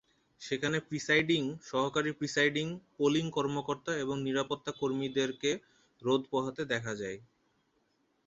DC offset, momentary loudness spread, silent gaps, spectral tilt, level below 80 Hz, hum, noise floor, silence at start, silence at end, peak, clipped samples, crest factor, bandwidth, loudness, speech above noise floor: under 0.1%; 10 LU; none; -4.5 dB/octave; -70 dBFS; none; -75 dBFS; 0.4 s; 1.05 s; -14 dBFS; under 0.1%; 20 dB; 8 kHz; -32 LUFS; 42 dB